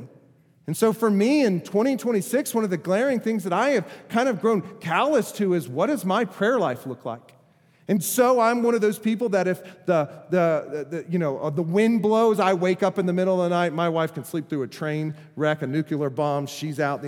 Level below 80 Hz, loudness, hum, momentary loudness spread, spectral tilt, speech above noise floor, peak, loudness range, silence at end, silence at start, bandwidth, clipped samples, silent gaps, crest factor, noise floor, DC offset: -78 dBFS; -23 LUFS; none; 9 LU; -6 dB/octave; 35 dB; -6 dBFS; 3 LU; 0 s; 0 s; 18 kHz; under 0.1%; none; 16 dB; -58 dBFS; under 0.1%